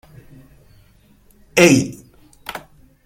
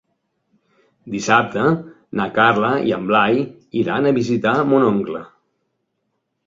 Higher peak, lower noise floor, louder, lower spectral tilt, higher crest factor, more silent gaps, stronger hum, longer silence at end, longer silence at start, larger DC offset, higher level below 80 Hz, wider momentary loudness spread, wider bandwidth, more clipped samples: about the same, 0 dBFS vs -2 dBFS; second, -52 dBFS vs -73 dBFS; first, -15 LUFS vs -18 LUFS; second, -4.5 dB/octave vs -6 dB/octave; about the same, 20 dB vs 18 dB; neither; neither; second, 0.45 s vs 1.2 s; first, 1.55 s vs 1.05 s; neither; first, -50 dBFS vs -58 dBFS; first, 23 LU vs 10 LU; first, 16.5 kHz vs 7.8 kHz; neither